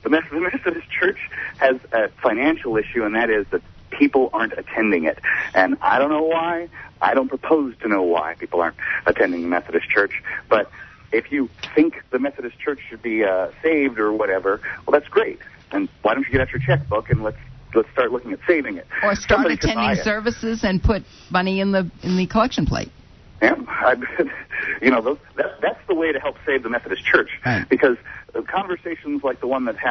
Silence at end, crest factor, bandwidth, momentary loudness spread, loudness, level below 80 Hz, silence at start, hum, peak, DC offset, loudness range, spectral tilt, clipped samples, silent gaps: 0 s; 18 dB; 6.4 kHz; 9 LU; -21 LUFS; -40 dBFS; 0.05 s; none; -2 dBFS; under 0.1%; 2 LU; -6.5 dB/octave; under 0.1%; none